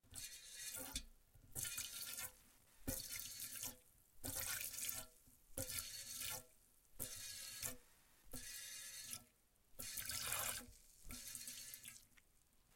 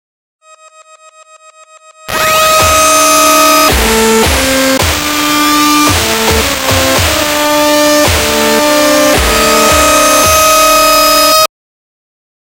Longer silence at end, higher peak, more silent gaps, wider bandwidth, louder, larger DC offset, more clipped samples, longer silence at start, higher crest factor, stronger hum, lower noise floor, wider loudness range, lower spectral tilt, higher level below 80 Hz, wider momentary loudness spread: second, 0 s vs 0.95 s; second, -24 dBFS vs 0 dBFS; neither; about the same, 17 kHz vs 17.5 kHz; second, -48 LUFS vs -7 LUFS; neither; neither; second, 0.05 s vs 2.05 s; first, 28 dB vs 10 dB; neither; first, -74 dBFS vs -39 dBFS; about the same, 3 LU vs 2 LU; second, -1 dB/octave vs -2.5 dB/octave; second, -66 dBFS vs -26 dBFS; first, 14 LU vs 4 LU